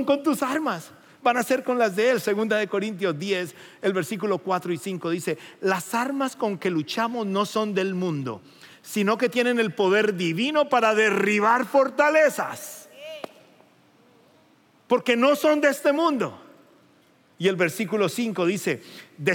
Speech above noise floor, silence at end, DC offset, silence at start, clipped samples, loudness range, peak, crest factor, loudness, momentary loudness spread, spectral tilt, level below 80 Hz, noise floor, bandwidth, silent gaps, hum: 36 dB; 0 s; under 0.1%; 0 s; under 0.1%; 6 LU; -6 dBFS; 18 dB; -23 LUFS; 12 LU; -4.5 dB/octave; -84 dBFS; -59 dBFS; 17 kHz; none; none